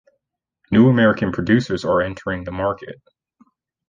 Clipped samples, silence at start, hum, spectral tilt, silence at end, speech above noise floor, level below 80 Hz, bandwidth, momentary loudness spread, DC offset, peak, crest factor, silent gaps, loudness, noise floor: under 0.1%; 0.7 s; none; -7.5 dB/octave; 0.95 s; 58 dB; -46 dBFS; 7.4 kHz; 13 LU; under 0.1%; -4 dBFS; 16 dB; none; -18 LUFS; -76 dBFS